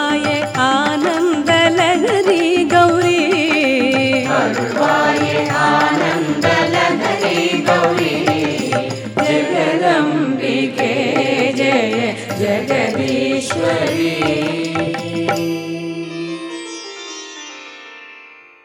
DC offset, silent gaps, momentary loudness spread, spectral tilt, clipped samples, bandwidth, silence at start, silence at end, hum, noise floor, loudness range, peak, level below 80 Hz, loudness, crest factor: under 0.1%; none; 12 LU; -4.5 dB/octave; under 0.1%; 17 kHz; 0 s; 0.3 s; none; -41 dBFS; 7 LU; 0 dBFS; -62 dBFS; -15 LUFS; 16 dB